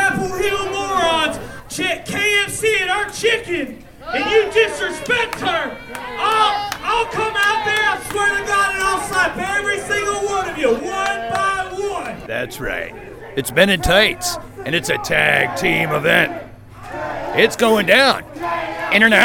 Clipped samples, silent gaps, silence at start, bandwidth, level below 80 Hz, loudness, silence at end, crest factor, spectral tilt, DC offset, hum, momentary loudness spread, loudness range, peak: under 0.1%; none; 0 s; 19 kHz; -42 dBFS; -17 LUFS; 0 s; 18 dB; -3 dB/octave; under 0.1%; none; 11 LU; 4 LU; 0 dBFS